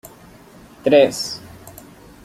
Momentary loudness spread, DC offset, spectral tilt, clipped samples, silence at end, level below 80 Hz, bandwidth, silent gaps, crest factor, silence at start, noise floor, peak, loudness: 26 LU; under 0.1%; -4 dB/octave; under 0.1%; 0.55 s; -54 dBFS; 15.5 kHz; none; 20 dB; 0.85 s; -44 dBFS; -2 dBFS; -17 LUFS